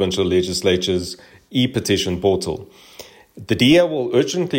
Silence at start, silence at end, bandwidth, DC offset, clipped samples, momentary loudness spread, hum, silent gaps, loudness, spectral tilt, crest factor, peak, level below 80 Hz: 0 s; 0 s; 16.5 kHz; under 0.1%; under 0.1%; 12 LU; none; none; -18 LUFS; -5 dB/octave; 16 dB; -4 dBFS; -48 dBFS